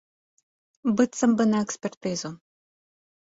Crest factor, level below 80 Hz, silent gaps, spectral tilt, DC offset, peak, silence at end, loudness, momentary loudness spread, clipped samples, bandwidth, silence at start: 20 dB; -68 dBFS; 1.97-2.01 s; -5 dB/octave; under 0.1%; -8 dBFS; 0.85 s; -25 LUFS; 10 LU; under 0.1%; 8 kHz; 0.85 s